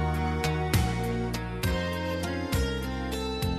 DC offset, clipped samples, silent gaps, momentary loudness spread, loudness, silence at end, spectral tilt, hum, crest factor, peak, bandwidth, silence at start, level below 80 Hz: under 0.1%; under 0.1%; none; 5 LU; -29 LUFS; 0 s; -5.5 dB/octave; none; 16 dB; -12 dBFS; 14 kHz; 0 s; -36 dBFS